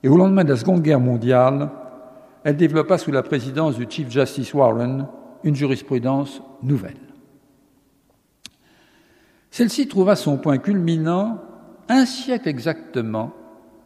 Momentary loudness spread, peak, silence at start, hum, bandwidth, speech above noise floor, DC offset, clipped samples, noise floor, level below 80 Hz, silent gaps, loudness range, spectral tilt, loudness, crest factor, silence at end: 12 LU; -2 dBFS; 0.05 s; none; 14 kHz; 43 dB; under 0.1%; under 0.1%; -61 dBFS; -66 dBFS; none; 8 LU; -7 dB/octave; -20 LUFS; 18 dB; 0.55 s